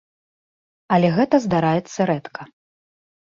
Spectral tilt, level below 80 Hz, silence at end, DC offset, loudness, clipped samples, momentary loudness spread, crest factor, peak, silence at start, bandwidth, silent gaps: -7 dB/octave; -58 dBFS; 0.8 s; under 0.1%; -19 LUFS; under 0.1%; 12 LU; 18 dB; -4 dBFS; 0.9 s; 7.6 kHz; none